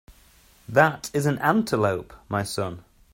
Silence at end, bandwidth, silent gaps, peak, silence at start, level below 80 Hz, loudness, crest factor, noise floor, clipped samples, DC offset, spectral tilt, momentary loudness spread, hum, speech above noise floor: 0.35 s; 16.5 kHz; none; -2 dBFS; 0.1 s; -56 dBFS; -24 LUFS; 22 dB; -55 dBFS; under 0.1%; under 0.1%; -5.5 dB/octave; 12 LU; none; 32 dB